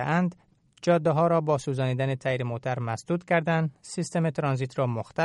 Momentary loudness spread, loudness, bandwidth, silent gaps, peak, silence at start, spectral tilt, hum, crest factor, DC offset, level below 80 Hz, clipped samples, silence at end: 8 LU; -27 LUFS; 11.5 kHz; none; -10 dBFS; 0 s; -7 dB/octave; none; 16 dB; under 0.1%; -64 dBFS; under 0.1%; 0 s